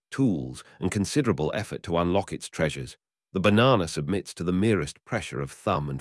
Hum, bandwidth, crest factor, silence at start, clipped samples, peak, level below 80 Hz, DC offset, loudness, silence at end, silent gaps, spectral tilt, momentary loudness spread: none; 12 kHz; 18 dB; 0.1 s; under 0.1%; -8 dBFS; -52 dBFS; under 0.1%; -26 LUFS; 0 s; none; -6 dB/octave; 12 LU